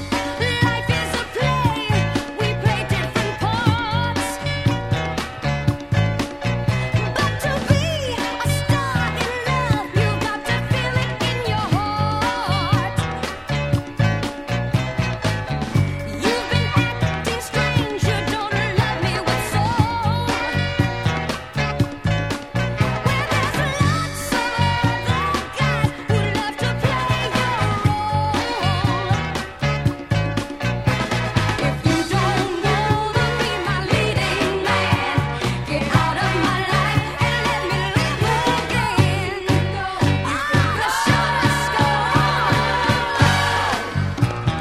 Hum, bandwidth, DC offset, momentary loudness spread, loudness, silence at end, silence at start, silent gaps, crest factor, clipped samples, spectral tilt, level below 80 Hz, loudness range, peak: none; 15 kHz; under 0.1%; 5 LU; -20 LUFS; 0 s; 0 s; none; 18 dB; under 0.1%; -5.5 dB/octave; -36 dBFS; 3 LU; -2 dBFS